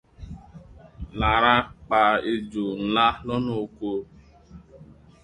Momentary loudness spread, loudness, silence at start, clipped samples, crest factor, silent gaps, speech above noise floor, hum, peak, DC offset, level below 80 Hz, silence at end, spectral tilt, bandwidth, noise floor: 23 LU; -23 LUFS; 0.2 s; under 0.1%; 22 dB; none; 26 dB; none; -4 dBFS; under 0.1%; -42 dBFS; 0.3 s; -6.5 dB/octave; 10.5 kHz; -49 dBFS